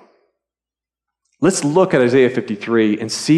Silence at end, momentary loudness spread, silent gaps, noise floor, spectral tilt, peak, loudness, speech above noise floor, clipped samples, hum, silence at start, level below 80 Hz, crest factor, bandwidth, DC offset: 0 s; 6 LU; none; -90 dBFS; -5 dB/octave; -2 dBFS; -16 LUFS; 75 dB; under 0.1%; none; 1.4 s; -62 dBFS; 14 dB; 13 kHz; under 0.1%